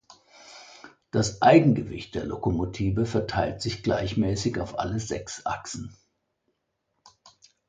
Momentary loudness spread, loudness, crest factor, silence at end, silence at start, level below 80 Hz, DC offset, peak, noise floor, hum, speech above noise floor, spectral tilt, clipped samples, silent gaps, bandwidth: 19 LU; -26 LUFS; 22 dB; 1.75 s; 0.1 s; -46 dBFS; under 0.1%; -4 dBFS; -77 dBFS; none; 52 dB; -6 dB/octave; under 0.1%; none; 9.4 kHz